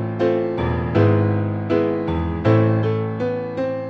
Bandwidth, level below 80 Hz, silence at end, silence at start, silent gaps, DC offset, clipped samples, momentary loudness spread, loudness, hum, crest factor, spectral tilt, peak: 6 kHz; -36 dBFS; 0 s; 0 s; none; under 0.1%; under 0.1%; 7 LU; -20 LUFS; none; 16 dB; -10 dB/octave; -4 dBFS